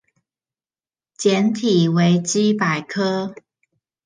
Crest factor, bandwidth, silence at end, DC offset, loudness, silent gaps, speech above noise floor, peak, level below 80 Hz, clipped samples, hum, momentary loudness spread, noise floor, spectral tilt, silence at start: 16 dB; 10 kHz; 0.7 s; under 0.1%; -18 LUFS; none; over 72 dB; -4 dBFS; -68 dBFS; under 0.1%; none; 6 LU; under -90 dBFS; -5.5 dB/octave; 1.2 s